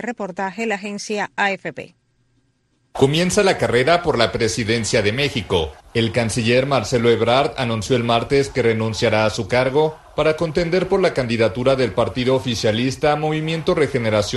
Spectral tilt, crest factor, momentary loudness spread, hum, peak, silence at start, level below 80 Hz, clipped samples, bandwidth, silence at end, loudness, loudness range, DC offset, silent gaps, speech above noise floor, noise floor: -5 dB/octave; 18 dB; 7 LU; none; -2 dBFS; 0 s; -44 dBFS; under 0.1%; 12.5 kHz; 0 s; -19 LUFS; 2 LU; under 0.1%; none; 46 dB; -64 dBFS